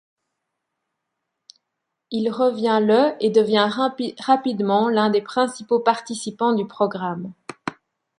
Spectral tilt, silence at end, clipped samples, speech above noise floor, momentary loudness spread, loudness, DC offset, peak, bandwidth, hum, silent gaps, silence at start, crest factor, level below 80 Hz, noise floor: -5 dB/octave; 0.5 s; under 0.1%; 60 dB; 13 LU; -20 LUFS; under 0.1%; -2 dBFS; 11 kHz; none; none; 2.1 s; 20 dB; -70 dBFS; -80 dBFS